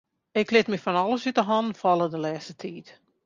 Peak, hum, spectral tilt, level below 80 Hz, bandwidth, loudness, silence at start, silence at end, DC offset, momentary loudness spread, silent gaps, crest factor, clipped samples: -6 dBFS; none; -5.5 dB/octave; -70 dBFS; 7.4 kHz; -25 LUFS; 0.35 s; 0.35 s; under 0.1%; 15 LU; none; 20 dB; under 0.1%